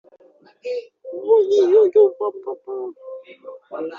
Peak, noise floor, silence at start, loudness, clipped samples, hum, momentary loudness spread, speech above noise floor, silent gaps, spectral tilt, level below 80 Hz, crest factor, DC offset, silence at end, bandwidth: -4 dBFS; -52 dBFS; 0.65 s; -18 LUFS; under 0.1%; none; 23 LU; 33 dB; none; -3.5 dB/octave; -76 dBFS; 16 dB; under 0.1%; 0 s; 7 kHz